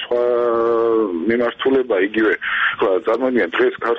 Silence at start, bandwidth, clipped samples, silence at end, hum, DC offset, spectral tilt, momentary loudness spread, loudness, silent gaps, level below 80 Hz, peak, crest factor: 0 s; 5.8 kHz; under 0.1%; 0 s; none; under 0.1%; -6.5 dB/octave; 2 LU; -17 LUFS; none; -56 dBFS; -6 dBFS; 12 dB